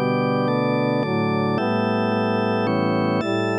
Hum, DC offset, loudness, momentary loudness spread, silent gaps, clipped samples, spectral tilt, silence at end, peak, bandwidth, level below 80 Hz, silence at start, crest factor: none; under 0.1%; -21 LUFS; 1 LU; none; under 0.1%; -8 dB/octave; 0 s; -8 dBFS; 9.6 kHz; -68 dBFS; 0 s; 12 dB